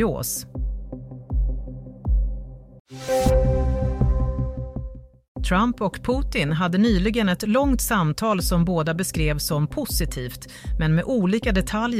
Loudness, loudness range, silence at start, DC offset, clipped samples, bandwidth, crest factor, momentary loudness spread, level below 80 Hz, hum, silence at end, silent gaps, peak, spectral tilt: -23 LUFS; 4 LU; 0 s; under 0.1%; under 0.1%; 16 kHz; 16 dB; 15 LU; -28 dBFS; none; 0 s; 2.80-2.85 s, 5.28-5.35 s; -8 dBFS; -5.5 dB/octave